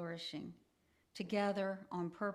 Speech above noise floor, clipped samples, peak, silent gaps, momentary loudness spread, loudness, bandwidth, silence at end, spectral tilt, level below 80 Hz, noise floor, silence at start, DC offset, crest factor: 36 dB; under 0.1%; -24 dBFS; none; 14 LU; -41 LUFS; 13 kHz; 0 s; -6 dB/octave; -82 dBFS; -77 dBFS; 0 s; under 0.1%; 18 dB